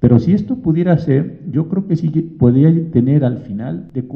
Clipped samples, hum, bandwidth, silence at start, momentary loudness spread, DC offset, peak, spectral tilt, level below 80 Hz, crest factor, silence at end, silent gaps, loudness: under 0.1%; none; 5.6 kHz; 0 s; 12 LU; under 0.1%; 0 dBFS; -11.5 dB/octave; -42 dBFS; 14 dB; 0 s; none; -15 LUFS